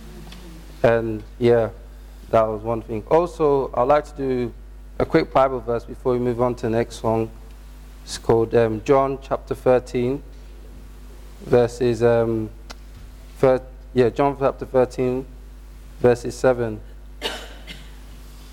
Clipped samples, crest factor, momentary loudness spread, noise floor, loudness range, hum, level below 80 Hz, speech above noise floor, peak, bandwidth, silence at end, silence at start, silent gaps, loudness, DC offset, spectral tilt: under 0.1%; 16 dB; 20 LU; -40 dBFS; 2 LU; none; -40 dBFS; 20 dB; -6 dBFS; 16 kHz; 0 s; 0 s; none; -21 LUFS; under 0.1%; -6.5 dB/octave